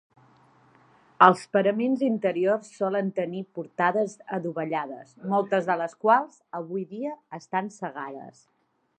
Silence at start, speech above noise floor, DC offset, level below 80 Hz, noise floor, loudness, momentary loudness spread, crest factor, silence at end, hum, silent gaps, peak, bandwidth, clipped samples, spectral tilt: 1.2 s; 33 dB; under 0.1%; -78 dBFS; -59 dBFS; -26 LUFS; 16 LU; 26 dB; 0.7 s; none; none; -2 dBFS; 11 kHz; under 0.1%; -6.5 dB/octave